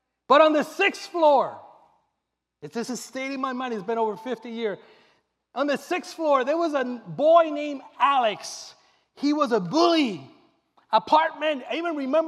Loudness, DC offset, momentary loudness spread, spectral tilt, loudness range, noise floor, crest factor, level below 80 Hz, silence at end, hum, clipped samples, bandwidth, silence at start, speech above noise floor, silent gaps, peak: -23 LUFS; under 0.1%; 14 LU; -4 dB/octave; 8 LU; -81 dBFS; 20 dB; -82 dBFS; 0 s; none; under 0.1%; 13.5 kHz; 0.3 s; 58 dB; none; -6 dBFS